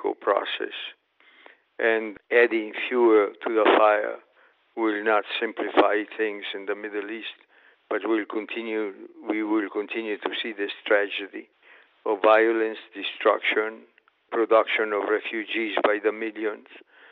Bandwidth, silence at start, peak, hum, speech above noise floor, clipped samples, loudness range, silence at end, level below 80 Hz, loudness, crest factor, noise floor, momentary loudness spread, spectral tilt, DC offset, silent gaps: 4.6 kHz; 0 s; -6 dBFS; none; 36 dB; under 0.1%; 7 LU; 0.35 s; -80 dBFS; -24 LUFS; 20 dB; -61 dBFS; 13 LU; 0 dB/octave; under 0.1%; none